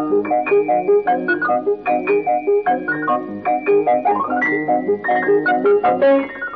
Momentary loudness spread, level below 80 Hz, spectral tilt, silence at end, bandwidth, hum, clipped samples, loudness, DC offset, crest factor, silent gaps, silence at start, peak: 4 LU; -60 dBFS; -4 dB/octave; 0 s; 4.7 kHz; none; under 0.1%; -17 LUFS; 0.1%; 10 dB; none; 0 s; -8 dBFS